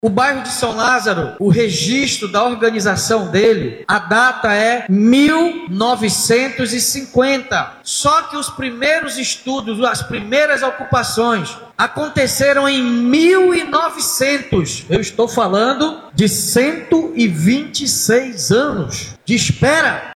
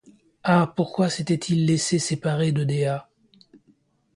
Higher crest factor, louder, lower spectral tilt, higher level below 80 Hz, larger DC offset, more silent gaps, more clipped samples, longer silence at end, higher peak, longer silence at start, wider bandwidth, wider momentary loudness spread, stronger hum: about the same, 14 dB vs 18 dB; first, -15 LUFS vs -23 LUFS; second, -4 dB/octave vs -5.5 dB/octave; first, -46 dBFS vs -62 dBFS; neither; neither; neither; second, 0 s vs 1.15 s; first, -2 dBFS vs -6 dBFS; second, 0.05 s vs 0.45 s; first, 16.5 kHz vs 11.5 kHz; about the same, 6 LU vs 5 LU; neither